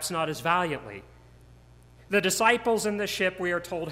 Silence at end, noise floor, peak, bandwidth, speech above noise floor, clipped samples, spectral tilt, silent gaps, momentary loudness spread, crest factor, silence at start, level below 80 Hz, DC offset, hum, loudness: 0 s; -53 dBFS; -8 dBFS; 16 kHz; 26 dB; under 0.1%; -3 dB/octave; none; 11 LU; 20 dB; 0 s; -58 dBFS; under 0.1%; none; -26 LUFS